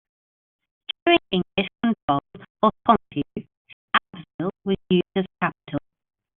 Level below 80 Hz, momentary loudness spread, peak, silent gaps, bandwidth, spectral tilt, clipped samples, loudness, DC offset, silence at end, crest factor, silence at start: -56 dBFS; 13 LU; -2 dBFS; 2.02-2.08 s, 2.50-2.55 s, 3.57-3.65 s, 3.73-3.88 s, 4.34-4.39 s; 4.2 kHz; -3.5 dB/octave; under 0.1%; -24 LUFS; under 0.1%; 0.6 s; 22 dB; 1.05 s